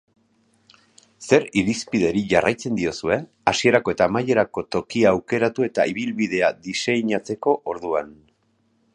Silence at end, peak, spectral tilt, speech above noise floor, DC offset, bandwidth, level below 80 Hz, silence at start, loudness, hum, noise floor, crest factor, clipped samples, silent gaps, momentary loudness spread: 0.85 s; -2 dBFS; -5 dB/octave; 44 dB; under 0.1%; 11 kHz; -54 dBFS; 1.2 s; -21 LUFS; none; -65 dBFS; 20 dB; under 0.1%; none; 7 LU